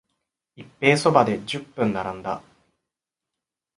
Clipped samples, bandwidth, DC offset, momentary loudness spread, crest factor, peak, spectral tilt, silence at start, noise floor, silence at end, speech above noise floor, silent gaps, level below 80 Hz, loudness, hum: under 0.1%; 11.5 kHz; under 0.1%; 14 LU; 24 dB; -2 dBFS; -5.5 dB/octave; 0.6 s; -86 dBFS; 1.4 s; 64 dB; none; -60 dBFS; -22 LUFS; none